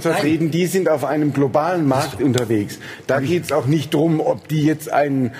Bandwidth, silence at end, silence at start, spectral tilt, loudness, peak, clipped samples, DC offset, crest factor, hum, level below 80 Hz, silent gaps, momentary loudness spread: 15.5 kHz; 0 s; 0 s; -6.5 dB/octave; -19 LUFS; -2 dBFS; under 0.1%; under 0.1%; 16 dB; none; -56 dBFS; none; 3 LU